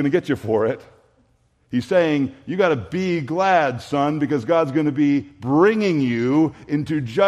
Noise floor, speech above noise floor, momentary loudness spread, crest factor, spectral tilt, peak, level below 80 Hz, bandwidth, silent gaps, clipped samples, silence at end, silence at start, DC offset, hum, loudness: -61 dBFS; 42 dB; 6 LU; 16 dB; -7 dB/octave; -4 dBFS; -58 dBFS; 10.5 kHz; none; under 0.1%; 0 s; 0 s; under 0.1%; none; -20 LUFS